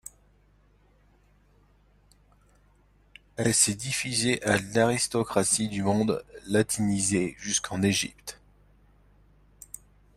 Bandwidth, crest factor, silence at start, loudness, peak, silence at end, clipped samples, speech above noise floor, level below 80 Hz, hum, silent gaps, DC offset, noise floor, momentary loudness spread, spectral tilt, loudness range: 15.5 kHz; 22 dB; 3.4 s; -26 LUFS; -8 dBFS; 1.8 s; under 0.1%; 35 dB; -58 dBFS; 50 Hz at -50 dBFS; none; under 0.1%; -62 dBFS; 19 LU; -3.5 dB/octave; 5 LU